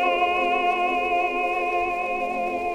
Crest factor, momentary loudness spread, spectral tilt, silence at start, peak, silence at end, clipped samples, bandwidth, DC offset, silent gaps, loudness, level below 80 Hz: 14 dB; 4 LU; -4 dB/octave; 0 s; -10 dBFS; 0 s; under 0.1%; 12 kHz; under 0.1%; none; -23 LUFS; -52 dBFS